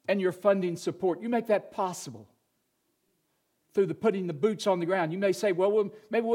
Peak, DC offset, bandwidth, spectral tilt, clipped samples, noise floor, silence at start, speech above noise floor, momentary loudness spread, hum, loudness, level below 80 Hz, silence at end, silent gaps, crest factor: -10 dBFS; under 0.1%; 16 kHz; -6 dB/octave; under 0.1%; -76 dBFS; 0.1 s; 48 dB; 7 LU; none; -28 LUFS; -80 dBFS; 0 s; none; 18 dB